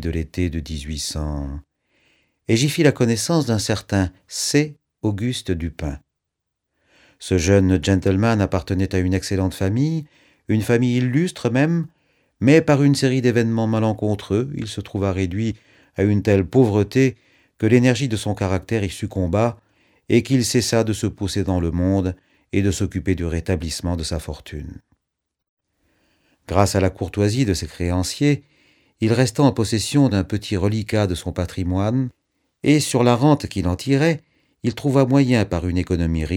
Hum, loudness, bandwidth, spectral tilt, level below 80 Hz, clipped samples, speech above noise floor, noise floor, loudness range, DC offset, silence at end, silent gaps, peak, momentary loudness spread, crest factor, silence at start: none; -20 LUFS; 16.5 kHz; -6 dB/octave; -40 dBFS; under 0.1%; 61 dB; -80 dBFS; 5 LU; under 0.1%; 0 s; 25.49-25.57 s; 0 dBFS; 11 LU; 20 dB; 0 s